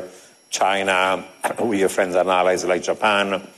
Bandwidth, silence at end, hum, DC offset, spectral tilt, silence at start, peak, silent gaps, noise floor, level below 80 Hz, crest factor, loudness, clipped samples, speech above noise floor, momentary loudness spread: 13 kHz; 0.1 s; none; under 0.1%; -3 dB/octave; 0 s; -6 dBFS; none; -42 dBFS; -64 dBFS; 14 dB; -20 LUFS; under 0.1%; 22 dB; 7 LU